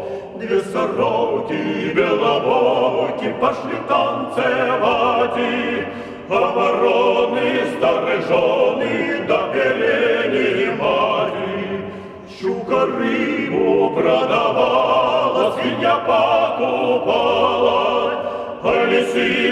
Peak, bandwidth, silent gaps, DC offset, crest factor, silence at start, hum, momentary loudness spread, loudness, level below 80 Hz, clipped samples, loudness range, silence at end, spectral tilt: -4 dBFS; 11 kHz; none; under 0.1%; 14 dB; 0 s; none; 7 LU; -18 LUFS; -54 dBFS; under 0.1%; 3 LU; 0 s; -5.5 dB/octave